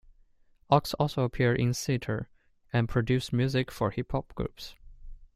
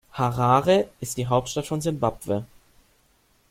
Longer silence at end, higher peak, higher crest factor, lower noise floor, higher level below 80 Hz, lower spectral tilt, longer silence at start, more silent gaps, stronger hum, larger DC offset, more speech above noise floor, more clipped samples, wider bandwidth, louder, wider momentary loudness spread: second, 0.1 s vs 1.05 s; about the same, -8 dBFS vs -6 dBFS; about the same, 22 dB vs 20 dB; about the same, -62 dBFS vs -63 dBFS; about the same, -48 dBFS vs -52 dBFS; about the same, -6 dB/octave vs -5.5 dB/octave; first, 0.7 s vs 0.15 s; neither; neither; neither; second, 34 dB vs 40 dB; neither; about the same, 15.5 kHz vs 16.5 kHz; second, -29 LUFS vs -24 LUFS; about the same, 11 LU vs 11 LU